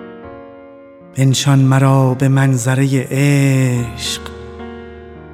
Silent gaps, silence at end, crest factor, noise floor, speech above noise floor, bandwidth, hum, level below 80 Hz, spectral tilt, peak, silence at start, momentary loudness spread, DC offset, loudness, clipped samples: none; 0 s; 14 dB; -39 dBFS; 26 dB; 14.5 kHz; none; -44 dBFS; -6 dB/octave; 0 dBFS; 0 s; 22 LU; under 0.1%; -14 LUFS; under 0.1%